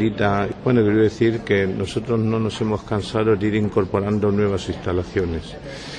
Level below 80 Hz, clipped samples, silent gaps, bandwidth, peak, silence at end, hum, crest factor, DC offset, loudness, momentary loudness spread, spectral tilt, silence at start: -44 dBFS; under 0.1%; none; 10 kHz; -6 dBFS; 0 s; none; 14 dB; under 0.1%; -21 LUFS; 7 LU; -7 dB/octave; 0 s